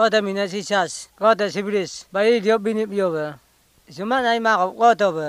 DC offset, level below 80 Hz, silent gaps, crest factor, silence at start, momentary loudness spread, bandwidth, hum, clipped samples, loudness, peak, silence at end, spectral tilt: under 0.1%; -64 dBFS; none; 18 dB; 0 s; 9 LU; 15 kHz; none; under 0.1%; -20 LUFS; -2 dBFS; 0 s; -4 dB/octave